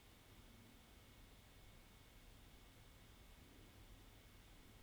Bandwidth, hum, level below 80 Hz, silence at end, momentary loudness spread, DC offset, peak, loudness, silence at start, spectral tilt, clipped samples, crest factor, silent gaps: over 20 kHz; none; -68 dBFS; 0 s; 1 LU; under 0.1%; -50 dBFS; -65 LUFS; 0 s; -4 dB/octave; under 0.1%; 14 dB; none